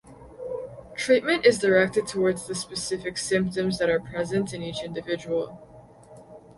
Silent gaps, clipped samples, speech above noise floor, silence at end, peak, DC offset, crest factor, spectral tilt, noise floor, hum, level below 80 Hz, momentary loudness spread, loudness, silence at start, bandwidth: none; under 0.1%; 24 dB; 0.05 s; -6 dBFS; under 0.1%; 20 dB; -4.5 dB/octave; -49 dBFS; none; -56 dBFS; 15 LU; -25 LUFS; 0.05 s; 11.5 kHz